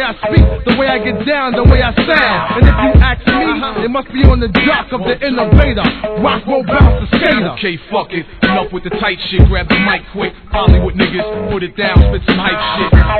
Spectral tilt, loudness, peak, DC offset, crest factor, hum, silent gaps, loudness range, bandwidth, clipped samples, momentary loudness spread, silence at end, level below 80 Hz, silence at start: -9.5 dB/octave; -12 LUFS; 0 dBFS; 0.2%; 12 dB; none; none; 3 LU; 4.6 kHz; 1%; 8 LU; 0 s; -16 dBFS; 0 s